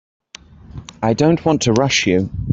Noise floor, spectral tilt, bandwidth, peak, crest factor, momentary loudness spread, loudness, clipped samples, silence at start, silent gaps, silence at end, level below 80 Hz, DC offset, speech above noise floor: -41 dBFS; -5 dB/octave; 8.2 kHz; -2 dBFS; 16 dB; 13 LU; -16 LUFS; under 0.1%; 0.7 s; none; 0 s; -40 dBFS; under 0.1%; 26 dB